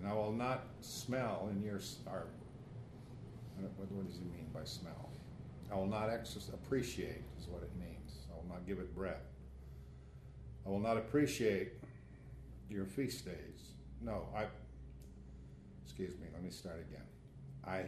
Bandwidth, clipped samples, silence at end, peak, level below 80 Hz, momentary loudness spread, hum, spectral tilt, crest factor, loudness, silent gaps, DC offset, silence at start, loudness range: 13.5 kHz; under 0.1%; 0 s; -22 dBFS; -58 dBFS; 18 LU; none; -6 dB/octave; 22 dB; -43 LUFS; none; under 0.1%; 0 s; 8 LU